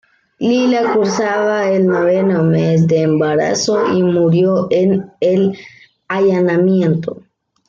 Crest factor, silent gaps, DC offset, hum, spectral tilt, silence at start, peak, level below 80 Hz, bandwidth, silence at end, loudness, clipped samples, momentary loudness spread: 12 dB; none; under 0.1%; none; -6.5 dB/octave; 0.4 s; -4 dBFS; -58 dBFS; 7.6 kHz; 0.55 s; -14 LUFS; under 0.1%; 4 LU